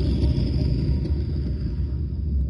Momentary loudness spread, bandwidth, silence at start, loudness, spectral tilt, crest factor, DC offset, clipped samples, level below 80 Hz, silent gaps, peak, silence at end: 5 LU; 5.8 kHz; 0 s; -25 LUFS; -9.5 dB/octave; 12 dB; under 0.1%; under 0.1%; -26 dBFS; none; -10 dBFS; 0 s